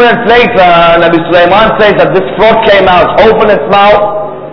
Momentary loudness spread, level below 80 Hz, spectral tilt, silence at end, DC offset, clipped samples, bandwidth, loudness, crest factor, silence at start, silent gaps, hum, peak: 3 LU; -30 dBFS; -7 dB/octave; 0 s; under 0.1%; 9%; 5.4 kHz; -5 LUFS; 4 dB; 0 s; none; none; 0 dBFS